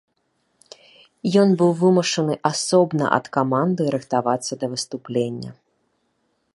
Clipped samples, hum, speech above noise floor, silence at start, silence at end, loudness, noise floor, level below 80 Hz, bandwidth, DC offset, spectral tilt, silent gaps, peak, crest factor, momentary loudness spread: under 0.1%; none; 49 dB; 1.25 s; 1.05 s; -20 LUFS; -69 dBFS; -66 dBFS; 11.5 kHz; under 0.1%; -5.5 dB/octave; none; -2 dBFS; 20 dB; 10 LU